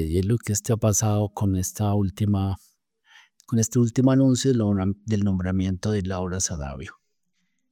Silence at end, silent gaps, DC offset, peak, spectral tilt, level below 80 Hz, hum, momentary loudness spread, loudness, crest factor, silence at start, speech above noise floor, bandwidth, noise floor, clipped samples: 0.8 s; none; under 0.1%; -8 dBFS; -6 dB/octave; -48 dBFS; none; 9 LU; -23 LUFS; 16 dB; 0 s; 53 dB; 16.5 kHz; -76 dBFS; under 0.1%